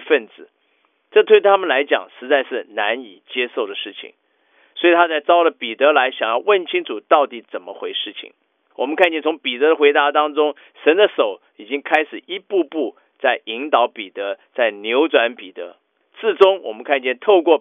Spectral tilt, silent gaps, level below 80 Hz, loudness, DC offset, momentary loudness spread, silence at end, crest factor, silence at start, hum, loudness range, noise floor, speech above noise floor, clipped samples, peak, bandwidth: 1 dB/octave; none; -84 dBFS; -18 LUFS; under 0.1%; 14 LU; 0 s; 18 dB; 0 s; none; 4 LU; -64 dBFS; 46 dB; under 0.1%; 0 dBFS; 3.8 kHz